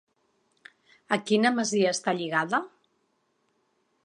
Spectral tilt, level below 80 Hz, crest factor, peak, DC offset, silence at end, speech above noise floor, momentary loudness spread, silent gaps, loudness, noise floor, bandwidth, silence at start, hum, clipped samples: -4 dB/octave; -80 dBFS; 22 dB; -8 dBFS; under 0.1%; 1.35 s; 47 dB; 7 LU; none; -26 LUFS; -73 dBFS; 10.5 kHz; 1.1 s; none; under 0.1%